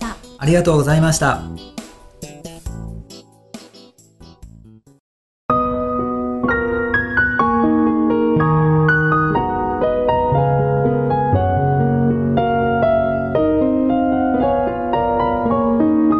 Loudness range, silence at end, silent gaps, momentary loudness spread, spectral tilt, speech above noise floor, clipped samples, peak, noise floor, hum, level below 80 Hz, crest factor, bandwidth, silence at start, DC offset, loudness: 12 LU; 0 s; 5.00-5.49 s; 17 LU; -6.5 dB/octave; 31 dB; under 0.1%; -2 dBFS; -46 dBFS; none; -36 dBFS; 14 dB; 12 kHz; 0 s; under 0.1%; -17 LUFS